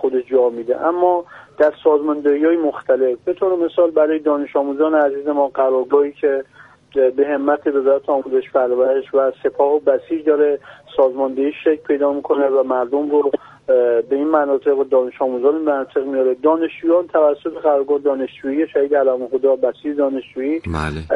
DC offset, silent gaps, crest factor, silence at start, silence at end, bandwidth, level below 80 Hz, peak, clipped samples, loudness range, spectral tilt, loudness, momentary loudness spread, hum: under 0.1%; none; 14 dB; 0 s; 0 s; 5.2 kHz; -48 dBFS; -2 dBFS; under 0.1%; 1 LU; -8 dB/octave; -17 LUFS; 5 LU; none